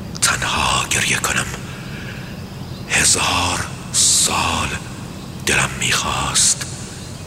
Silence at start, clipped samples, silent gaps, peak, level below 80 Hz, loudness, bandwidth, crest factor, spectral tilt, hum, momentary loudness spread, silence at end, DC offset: 0 s; under 0.1%; none; -2 dBFS; -38 dBFS; -16 LUFS; 16 kHz; 18 dB; -1.5 dB/octave; none; 18 LU; 0 s; under 0.1%